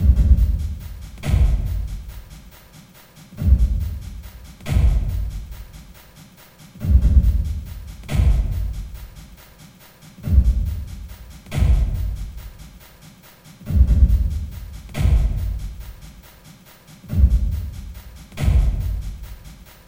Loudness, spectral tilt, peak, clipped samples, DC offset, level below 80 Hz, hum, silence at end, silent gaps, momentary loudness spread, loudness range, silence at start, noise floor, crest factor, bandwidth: -21 LUFS; -7.5 dB/octave; -2 dBFS; under 0.1%; under 0.1%; -22 dBFS; none; 0.3 s; none; 23 LU; 4 LU; 0 s; -46 dBFS; 18 dB; 16.5 kHz